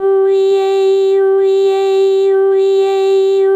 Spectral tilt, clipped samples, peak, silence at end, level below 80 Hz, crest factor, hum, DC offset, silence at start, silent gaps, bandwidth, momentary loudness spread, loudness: -3.5 dB/octave; under 0.1%; -6 dBFS; 0 s; -66 dBFS; 6 dB; none; under 0.1%; 0 s; none; 8 kHz; 1 LU; -12 LUFS